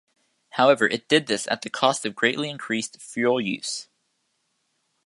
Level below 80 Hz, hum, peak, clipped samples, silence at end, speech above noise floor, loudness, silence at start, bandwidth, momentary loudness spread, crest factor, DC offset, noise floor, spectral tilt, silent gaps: -74 dBFS; none; -2 dBFS; under 0.1%; 1.25 s; 50 dB; -23 LUFS; 0.55 s; 11.5 kHz; 11 LU; 22 dB; under 0.1%; -73 dBFS; -3 dB/octave; none